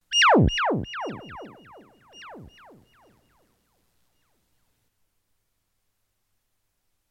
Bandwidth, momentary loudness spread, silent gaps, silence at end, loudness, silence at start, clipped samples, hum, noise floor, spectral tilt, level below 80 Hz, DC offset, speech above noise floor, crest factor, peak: 12 kHz; 28 LU; none; 4.65 s; -21 LUFS; 0.1 s; under 0.1%; none; -74 dBFS; -4.5 dB/octave; -44 dBFS; under 0.1%; 48 dB; 20 dB; -8 dBFS